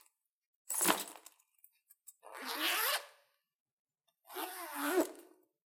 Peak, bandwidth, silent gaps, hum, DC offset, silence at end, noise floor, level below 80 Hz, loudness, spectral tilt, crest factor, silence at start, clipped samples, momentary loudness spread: -12 dBFS; 16.5 kHz; 3.55-3.66 s, 3.72-3.86 s; none; under 0.1%; 0.4 s; -72 dBFS; -82 dBFS; -35 LUFS; -1 dB/octave; 28 dB; 0.7 s; under 0.1%; 24 LU